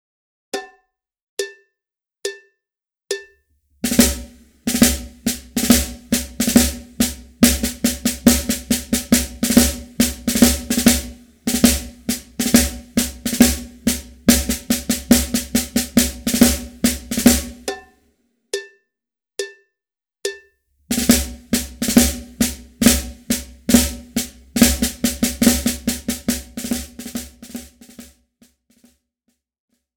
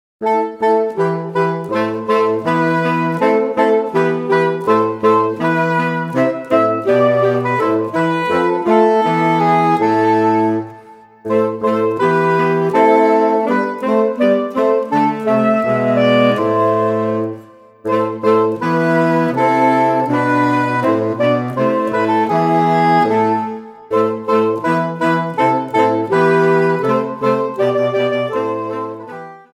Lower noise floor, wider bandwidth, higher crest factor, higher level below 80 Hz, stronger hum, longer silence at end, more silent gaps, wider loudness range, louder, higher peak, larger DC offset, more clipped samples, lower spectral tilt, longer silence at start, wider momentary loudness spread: first, -89 dBFS vs -40 dBFS; first, over 20 kHz vs 14 kHz; first, 20 dB vs 14 dB; first, -32 dBFS vs -62 dBFS; neither; first, 1.9 s vs 0.2 s; first, 1.22-1.37 s vs none; first, 11 LU vs 2 LU; second, -18 LUFS vs -15 LUFS; about the same, 0 dBFS vs 0 dBFS; neither; neither; second, -3 dB/octave vs -7.5 dB/octave; first, 0.55 s vs 0.2 s; first, 15 LU vs 6 LU